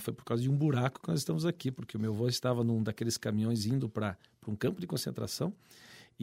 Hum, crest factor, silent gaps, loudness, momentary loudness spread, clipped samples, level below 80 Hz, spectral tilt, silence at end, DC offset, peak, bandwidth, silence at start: none; 18 dB; none; -33 LUFS; 8 LU; under 0.1%; -68 dBFS; -6 dB/octave; 0 s; under 0.1%; -16 dBFS; 16 kHz; 0 s